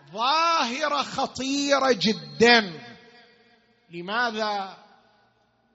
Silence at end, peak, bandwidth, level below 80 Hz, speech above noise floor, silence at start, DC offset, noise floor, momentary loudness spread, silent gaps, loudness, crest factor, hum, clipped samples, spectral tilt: 1 s; -4 dBFS; 8 kHz; -64 dBFS; 42 dB; 0.1 s; under 0.1%; -65 dBFS; 19 LU; none; -23 LUFS; 22 dB; none; under 0.1%; -1 dB/octave